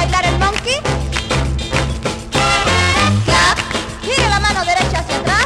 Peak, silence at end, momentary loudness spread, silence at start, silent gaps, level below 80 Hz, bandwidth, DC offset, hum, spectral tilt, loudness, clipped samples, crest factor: -2 dBFS; 0 s; 7 LU; 0 s; none; -24 dBFS; 13.5 kHz; under 0.1%; none; -3.5 dB/octave; -15 LUFS; under 0.1%; 14 dB